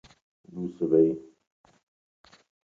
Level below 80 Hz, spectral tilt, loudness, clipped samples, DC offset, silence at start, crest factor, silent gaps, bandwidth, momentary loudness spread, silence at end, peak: -66 dBFS; -10 dB/octave; -26 LUFS; under 0.1%; under 0.1%; 0.55 s; 20 dB; none; 7.2 kHz; 17 LU; 1.5 s; -10 dBFS